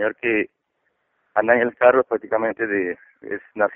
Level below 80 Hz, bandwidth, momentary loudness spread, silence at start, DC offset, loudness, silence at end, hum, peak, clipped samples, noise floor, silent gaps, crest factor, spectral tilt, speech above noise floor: -64 dBFS; 3.5 kHz; 16 LU; 0 s; under 0.1%; -20 LUFS; 0 s; none; -2 dBFS; under 0.1%; -72 dBFS; none; 20 dB; 1.5 dB/octave; 51 dB